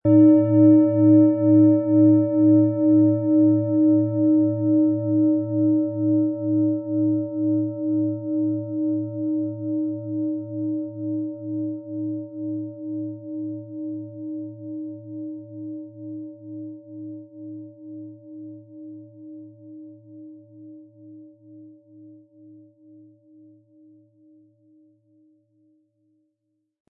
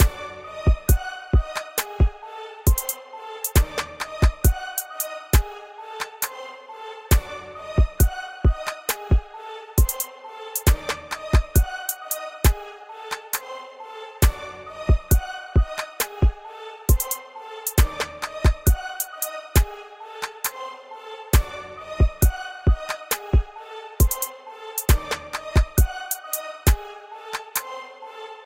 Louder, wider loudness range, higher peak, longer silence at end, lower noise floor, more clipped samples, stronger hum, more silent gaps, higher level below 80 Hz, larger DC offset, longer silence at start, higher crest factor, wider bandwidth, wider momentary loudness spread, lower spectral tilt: first, -21 LUFS vs -24 LUFS; first, 23 LU vs 2 LU; about the same, -6 dBFS vs -4 dBFS; first, 4.8 s vs 0.05 s; first, -76 dBFS vs -39 dBFS; neither; neither; neither; second, -70 dBFS vs -24 dBFS; neither; about the same, 0.05 s vs 0 s; about the same, 16 dB vs 20 dB; second, 2.4 kHz vs 17 kHz; first, 24 LU vs 16 LU; first, -15.5 dB/octave vs -4.5 dB/octave